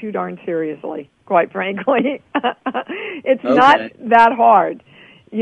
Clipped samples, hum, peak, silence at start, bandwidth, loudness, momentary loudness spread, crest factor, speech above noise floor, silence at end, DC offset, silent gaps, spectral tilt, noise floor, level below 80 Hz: under 0.1%; none; 0 dBFS; 0 s; 9 kHz; -16 LUFS; 16 LU; 16 dB; 19 dB; 0 s; under 0.1%; none; -6 dB/octave; -35 dBFS; -62 dBFS